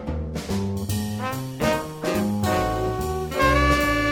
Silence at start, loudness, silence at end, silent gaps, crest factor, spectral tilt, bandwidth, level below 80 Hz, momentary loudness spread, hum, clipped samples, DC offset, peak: 0 s; -24 LUFS; 0 s; none; 20 dB; -5.5 dB/octave; 17 kHz; -34 dBFS; 9 LU; none; under 0.1%; under 0.1%; -4 dBFS